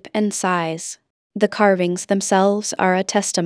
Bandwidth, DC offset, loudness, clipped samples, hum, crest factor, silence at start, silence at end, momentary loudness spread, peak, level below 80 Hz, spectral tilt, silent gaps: 11 kHz; under 0.1%; -19 LUFS; under 0.1%; none; 18 dB; 0.05 s; 0 s; 12 LU; -2 dBFS; -70 dBFS; -4 dB/octave; 1.10-1.30 s